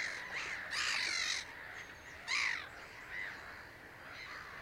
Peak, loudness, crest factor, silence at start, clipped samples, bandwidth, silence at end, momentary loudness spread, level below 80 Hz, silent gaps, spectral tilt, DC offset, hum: -22 dBFS; -38 LUFS; 20 dB; 0 s; under 0.1%; 16 kHz; 0 s; 16 LU; -68 dBFS; none; 0 dB/octave; under 0.1%; none